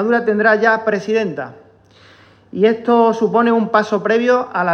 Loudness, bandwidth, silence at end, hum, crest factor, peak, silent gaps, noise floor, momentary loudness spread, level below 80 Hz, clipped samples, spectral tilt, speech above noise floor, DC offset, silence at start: -15 LUFS; 6.8 kHz; 0 s; none; 14 dB; -2 dBFS; none; -47 dBFS; 8 LU; -66 dBFS; under 0.1%; -6.5 dB/octave; 32 dB; under 0.1%; 0 s